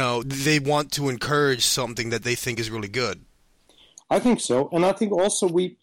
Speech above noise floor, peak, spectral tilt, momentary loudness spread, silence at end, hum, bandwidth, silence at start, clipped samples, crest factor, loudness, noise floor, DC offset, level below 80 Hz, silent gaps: 36 dB; -8 dBFS; -4 dB/octave; 7 LU; 0.1 s; none; 16.5 kHz; 0 s; under 0.1%; 16 dB; -23 LUFS; -59 dBFS; under 0.1%; -52 dBFS; none